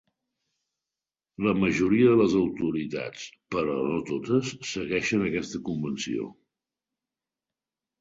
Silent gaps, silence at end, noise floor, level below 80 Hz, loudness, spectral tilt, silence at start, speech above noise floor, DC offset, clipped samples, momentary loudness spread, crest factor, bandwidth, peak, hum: none; 1.7 s; under -90 dBFS; -58 dBFS; -26 LUFS; -6 dB/octave; 1.4 s; over 64 dB; under 0.1%; under 0.1%; 13 LU; 18 dB; 7.8 kHz; -8 dBFS; none